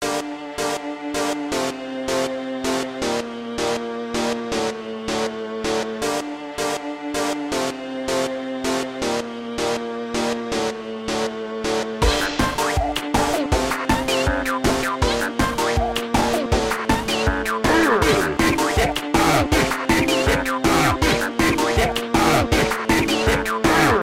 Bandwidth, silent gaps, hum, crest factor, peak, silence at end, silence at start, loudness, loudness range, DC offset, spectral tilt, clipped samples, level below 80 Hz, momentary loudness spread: 16.5 kHz; none; none; 16 dB; -6 dBFS; 0 s; 0 s; -21 LUFS; 6 LU; under 0.1%; -4 dB/octave; under 0.1%; -34 dBFS; 9 LU